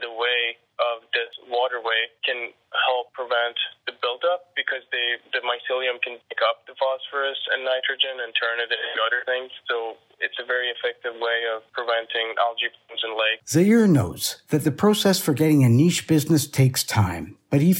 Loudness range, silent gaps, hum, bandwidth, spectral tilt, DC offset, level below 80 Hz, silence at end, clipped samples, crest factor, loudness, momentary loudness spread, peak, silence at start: 6 LU; none; none; 17 kHz; -4.5 dB/octave; under 0.1%; -60 dBFS; 0 s; under 0.1%; 18 dB; -23 LUFS; 9 LU; -6 dBFS; 0 s